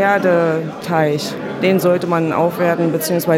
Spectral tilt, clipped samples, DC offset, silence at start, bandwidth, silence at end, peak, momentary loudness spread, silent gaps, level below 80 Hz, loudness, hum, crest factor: -6 dB/octave; under 0.1%; under 0.1%; 0 s; 16.5 kHz; 0 s; -2 dBFS; 6 LU; none; -60 dBFS; -16 LUFS; none; 14 dB